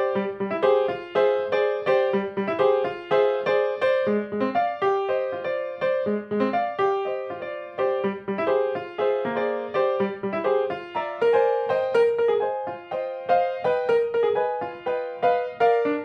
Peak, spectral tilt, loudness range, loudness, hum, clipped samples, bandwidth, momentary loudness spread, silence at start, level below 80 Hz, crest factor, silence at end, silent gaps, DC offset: -8 dBFS; -7 dB/octave; 3 LU; -24 LUFS; none; under 0.1%; 6.2 kHz; 7 LU; 0 s; -68 dBFS; 16 dB; 0 s; none; under 0.1%